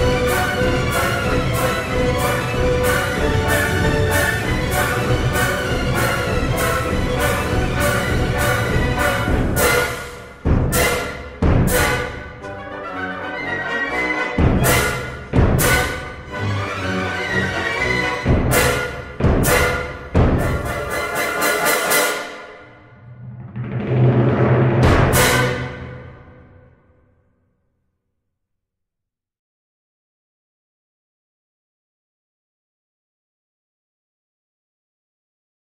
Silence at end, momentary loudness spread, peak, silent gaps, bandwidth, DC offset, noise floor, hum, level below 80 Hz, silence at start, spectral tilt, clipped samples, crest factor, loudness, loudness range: 9.45 s; 11 LU; -2 dBFS; none; 16.5 kHz; under 0.1%; -83 dBFS; none; -28 dBFS; 0 s; -4.5 dB/octave; under 0.1%; 18 dB; -18 LUFS; 3 LU